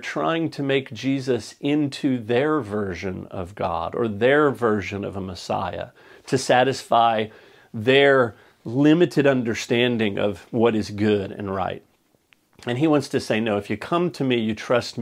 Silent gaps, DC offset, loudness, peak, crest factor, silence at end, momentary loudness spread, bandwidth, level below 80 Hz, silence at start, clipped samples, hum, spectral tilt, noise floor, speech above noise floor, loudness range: none; under 0.1%; -22 LUFS; -2 dBFS; 20 dB; 0 s; 12 LU; 14.5 kHz; -58 dBFS; 0 s; under 0.1%; none; -5.5 dB/octave; -61 dBFS; 40 dB; 5 LU